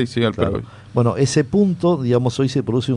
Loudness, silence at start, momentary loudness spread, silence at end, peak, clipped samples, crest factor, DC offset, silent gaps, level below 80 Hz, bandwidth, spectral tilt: -19 LUFS; 0 s; 5 LU; 0 s; -2 dBFS; under 0.1%; 16 dB; under 0.1%; none; -46 dBFS; 11 kHz; -6.5 dB/octave